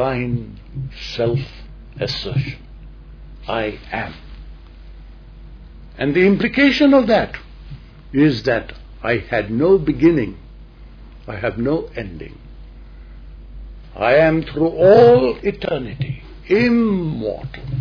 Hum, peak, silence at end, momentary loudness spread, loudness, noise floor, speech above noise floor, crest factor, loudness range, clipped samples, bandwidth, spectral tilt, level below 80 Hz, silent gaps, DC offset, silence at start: none; -2 dBFS; 0 s; 22 LU; -17 LUFS; -39 dBFS; 22 dB; 18 dB; 12 LU; under 0.1%; 5.4 kHz; -7.5 dB/octave; -38 dBFS; none; under 0.1%; 0 s